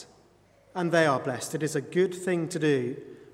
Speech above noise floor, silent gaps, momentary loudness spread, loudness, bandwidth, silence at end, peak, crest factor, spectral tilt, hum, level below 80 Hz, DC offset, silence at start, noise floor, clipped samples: 33 dB; none; 10 LU; -27 LUFS; 16 kHz; 0.05 s; -8 dBFS; 20 dB; -5.5 dB/octave; none; -72 dBFS; under 0.1%; 0 s; -60 dBFS; under 0.1%